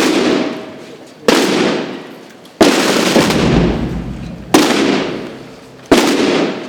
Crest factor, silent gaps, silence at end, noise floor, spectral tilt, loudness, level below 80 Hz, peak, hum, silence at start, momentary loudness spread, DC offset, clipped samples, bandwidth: 14 dB; none; 0 s; -36 dBFS; -4.5 dB/octave; -13 LUFS; -34 dBFS; 0 dBFS; none; 0 s; 19 LU; under 0.1%; 0.2%; over 20 kHz